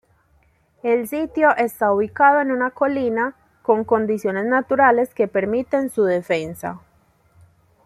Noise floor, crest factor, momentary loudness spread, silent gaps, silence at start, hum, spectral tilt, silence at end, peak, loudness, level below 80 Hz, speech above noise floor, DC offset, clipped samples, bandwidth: -60 dBFS; 18 dB; 11 LU; none; 0.85 s; none; -6 dB/octave; 1.1 s; -2 dBFS; -19 LUFS; -60 dBFS; 41 dB; under 0.1%; under 0.1%; 15 kHz